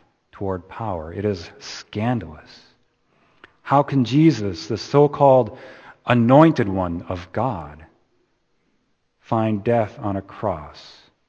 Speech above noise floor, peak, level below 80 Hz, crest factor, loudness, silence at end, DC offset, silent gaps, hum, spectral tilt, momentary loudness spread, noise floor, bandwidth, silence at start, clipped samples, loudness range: 47 dB; 0 dBFS; -52 dBFS; 22 dB; -20 LUFS; 0.45 s; under 0.1%; none; none; -7.5 dB/octave; 17 LU; -67 dBFS; 7.4 kHz; 0.35 s; under 0.1%; 9 LU